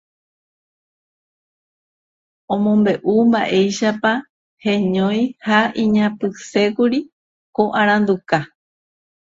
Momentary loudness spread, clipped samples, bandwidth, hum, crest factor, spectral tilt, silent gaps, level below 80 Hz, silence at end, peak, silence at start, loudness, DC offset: 9 LU; under 0.1%; 7.8 kHz; none; 18 dB; -6 dB/octave; 4.29-4.57 s, 7.12-7.53 s; -60 dBFS; 0.95 s; 0 dBFS; 2.5 s; -18 LUFS; under 0.1%